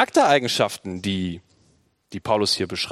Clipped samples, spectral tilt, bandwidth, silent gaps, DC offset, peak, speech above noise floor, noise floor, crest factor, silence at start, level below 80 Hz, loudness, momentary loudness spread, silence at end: under 0.1%; -4 dB/octave; 16 kHz; none; under 0.1%; -2 dBFS; 40 dB; -62 dBFS; 22 dB; 0 s; -62 dBFS; -22 LUFS; 16 LU; 0 s